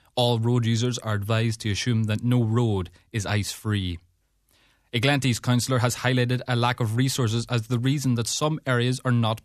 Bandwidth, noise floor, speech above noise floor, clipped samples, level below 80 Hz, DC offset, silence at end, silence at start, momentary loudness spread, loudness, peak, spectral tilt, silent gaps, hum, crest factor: 14 kHz; -66 dBFS; 42 dB; under 0.1%; -54 dBFS; under 0.1%; 0.05 s; 0.15 s; 5 LU; -24 LUFS; -8 dBFS; -5.5 dB/octave; none; none; 16 dB